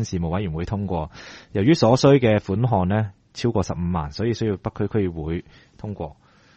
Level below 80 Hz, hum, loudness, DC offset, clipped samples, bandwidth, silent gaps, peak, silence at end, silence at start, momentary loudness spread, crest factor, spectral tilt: -42 dBFS; none; -22 LUFS; under 0.1%; under 0.1%; 8.4 kHz; none; -2 dBFS; 0.45 s; 0 s; 17 LU; 20 dB; -7 dB/octave